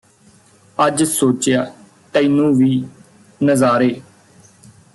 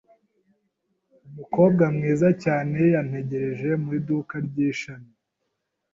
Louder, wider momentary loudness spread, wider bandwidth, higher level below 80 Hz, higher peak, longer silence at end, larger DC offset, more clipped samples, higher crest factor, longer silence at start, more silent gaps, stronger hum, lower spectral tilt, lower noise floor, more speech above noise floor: first, -16 LUFS vs -23 LUFS; first, 14 LU vs 10 LU; first, 12.5 kHz vs 7.6 kHz; about the same, -58 dBFS vs -62 dBFS; about the same, -4 dBFS vs -6 dBFS; about the same, 0.95 s vs 0.9 s; neither; neither; about the same, 14 dB vs 18 dB; second, 0.8 s vs 1.25 s; neither; neither; second, -5 dB/octave vs -8.5 dB/octave; second, -50 dBFS vs -78 dBFS; second, 36 dB vs 56 dB